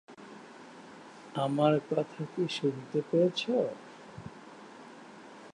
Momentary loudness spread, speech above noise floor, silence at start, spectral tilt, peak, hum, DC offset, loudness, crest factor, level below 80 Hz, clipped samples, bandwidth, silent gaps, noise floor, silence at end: 22 LU; 20 dB; 0.1 s; -6.5 dB/octave; -12 dBFS; none; under 0.1%; -31 LUFS; 20 dB; -74 dBFS; under 0.1%; 11 kHz; none; -50 dBFS; 0 s